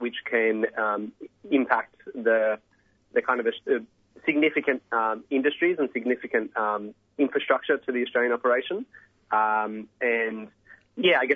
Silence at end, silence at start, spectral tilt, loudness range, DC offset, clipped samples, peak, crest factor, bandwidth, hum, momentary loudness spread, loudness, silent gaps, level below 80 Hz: 0 s; 0 s; -6.5 dB/octave; 1 LU; under 0.1%; under 0.1%; -4 dBFS; 22 dB; 4.2 kHz; none; 10 LU; -26 LUFS; none; -74 dBFS